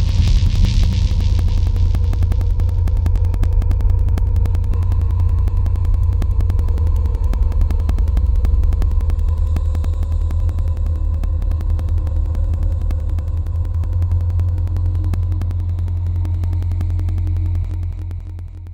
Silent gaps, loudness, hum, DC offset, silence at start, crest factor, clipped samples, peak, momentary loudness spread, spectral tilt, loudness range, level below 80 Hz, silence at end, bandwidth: none; -19 LUFS; none; under 0.1%; 0 s; 12 dB; under 0.1%; -4 dBFS; 4 LU; -7.5 dB/octave; 3 LU; -18 dBFS; 0 s; 7.2 kHz